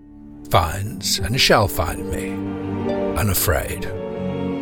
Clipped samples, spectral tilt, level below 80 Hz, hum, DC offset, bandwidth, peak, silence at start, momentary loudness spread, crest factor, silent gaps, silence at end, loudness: under 0.1%; -4 dB/octave; -36 dBFS; none; under 0.1%; 19.5 kHz; -2 dBFS; 0 s; 12 LU; 20 dB; none; 0 s; -21 LUFS